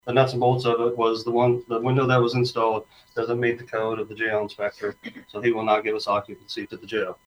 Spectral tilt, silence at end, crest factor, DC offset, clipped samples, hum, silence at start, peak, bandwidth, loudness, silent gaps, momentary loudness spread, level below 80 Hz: -7 dB/octave; 0.1 s; 18 dB; under 0.1%; under 0.1%; none; 0.05 s; -6 dBFS; 11.5 kHz; -24 LUFS; none; 12 LU; -64 dBFS